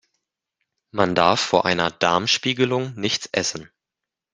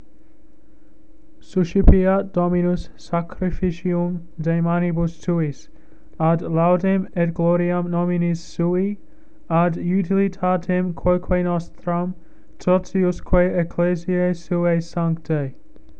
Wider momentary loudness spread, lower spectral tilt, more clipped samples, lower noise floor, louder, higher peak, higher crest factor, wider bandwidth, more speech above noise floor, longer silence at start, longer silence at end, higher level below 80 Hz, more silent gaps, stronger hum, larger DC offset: about the same, 7 LU vs 8 LU; second, -3.5 dB/octave vs -9 dB/octave; neither; first, -86 dBFS vs -52 dBFS; about the same, -20 LUFS vs -21 LUFS; about the same, -2 dBFS vs 0 dBFS; about the same, 22 dB vs 20 dB; first, 10 kHz vs 7.4 kHz; first, 65 dB vs 33 dB; second, 0.95 s vs 1.55 s; first, 0.7 s vs 0.2 s; second, -60 dBFS vs -30 dBFS; neither; neither; second, under 0.1% vs 2%